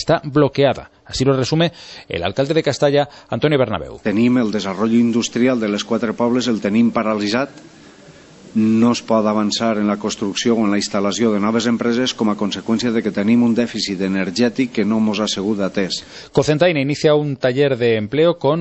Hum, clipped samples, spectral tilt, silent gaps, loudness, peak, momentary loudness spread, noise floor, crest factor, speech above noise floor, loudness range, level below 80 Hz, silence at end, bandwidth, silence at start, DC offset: none; under 0.1%; -5.5 dB/octave; none; -18 LUFS; -2 dBFS; 6 LU; -43 dBFS; 16 dB; 26 dB; 2 LU; -50 dBFS; 0 s; 8.4 kHz; 0 s; under 0.1%